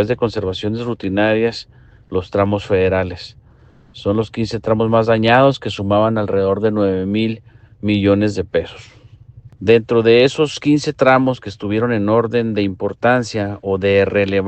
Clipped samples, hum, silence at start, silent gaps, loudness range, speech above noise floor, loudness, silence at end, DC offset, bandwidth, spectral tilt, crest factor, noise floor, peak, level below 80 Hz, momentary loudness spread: under 0.1%; none; 0 s; none; 4 LU; 31 dB; -17 LUFS; 0 s; under 0.1%; 8.6 kHz; -6.5 dB/octave; 16 dB; -47 dBFS; 0 dBFS; -46 dBFS; 10 LU